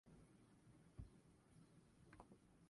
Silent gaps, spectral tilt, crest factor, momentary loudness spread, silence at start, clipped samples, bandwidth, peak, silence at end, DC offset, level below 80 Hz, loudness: none; -6.5 dB/octave; 22 dB; 6 LU; 0.05 s; under 0.1%; 11 kHz; -44 dBFS; 0 s; under 0.1%; -72 dBFS; -66 LUFS